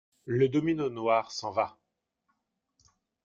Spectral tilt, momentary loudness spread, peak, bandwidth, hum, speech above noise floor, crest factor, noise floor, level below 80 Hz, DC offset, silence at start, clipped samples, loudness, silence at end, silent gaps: -6.5 dB/octave; 7 LU; -12 dBFS; 7.6 kHz; none; 53 dB; 20 dB; -81 dBFS; -70 dBFS; under 0.1%; 0.25 s; under 0.1%; -29 LUFS; 1.55 s; none